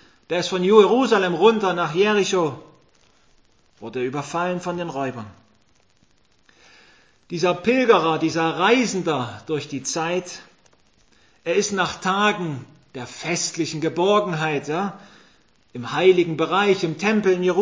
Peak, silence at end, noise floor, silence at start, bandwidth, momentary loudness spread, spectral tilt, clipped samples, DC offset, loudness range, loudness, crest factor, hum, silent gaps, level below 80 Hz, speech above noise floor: 0 dBFS; 0 s; -62 dBFS; 0.3 s; 8 kHz; 17 LU; -4.5 dB/octave; under 0.1%; under 0.1%; 10 LU; -21 LUFS; 22 dB; none; none; -64 dBFS; 41 dB